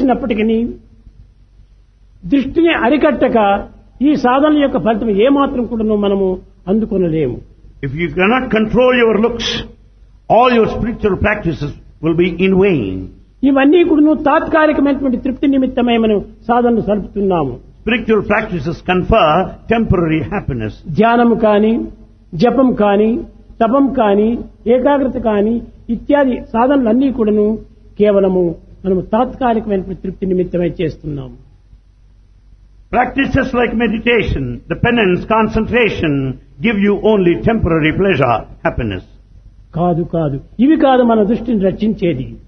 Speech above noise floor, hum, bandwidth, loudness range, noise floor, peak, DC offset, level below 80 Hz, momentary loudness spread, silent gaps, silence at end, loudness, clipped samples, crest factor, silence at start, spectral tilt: 32 dB; none; 6.4 kHz; 4 LU; -46 dBFS; 0 dBFS; under 0.1%; -34 dBFS; 11 LU; none; 0.05 s; -14 LUFS; under 0.1%; 14 dB; 0 s; -7.5 dB/octave